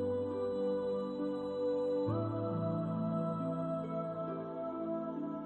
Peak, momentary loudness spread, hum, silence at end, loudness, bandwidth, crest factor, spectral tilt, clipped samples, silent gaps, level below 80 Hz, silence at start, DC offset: -24 dBFS; 5 LU; none; 0 s; -37 LUFS; 8.4 kHz; 12 dB; -10 dB/octave; under 0.1%; none; -70 dBFS; 0 s; under 0.1%